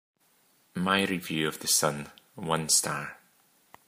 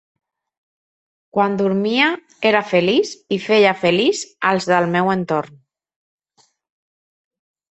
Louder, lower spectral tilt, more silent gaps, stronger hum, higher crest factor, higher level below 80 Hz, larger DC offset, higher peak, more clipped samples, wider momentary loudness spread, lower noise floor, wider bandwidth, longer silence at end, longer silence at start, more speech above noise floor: second, -27 LUFS vs -17 LUFS; second, -2.5 dB/octave vs -5 dB/octave; neither; neither; first, 24 dB vs 18 dB; second, -68 dBFS vs -62 dBFS; neither; second, -8 dBFS vs -2 dBFS; neither; first, 17 LU vs 8 LU; first, -66 dBFS vs -61 dBFS; first, 15.5 kHz vs 8.2 kHz; second, 0.7 s vs 2.3 s; second, 0.75 s vs 1.35 s; second, 38 dB vs 44 dB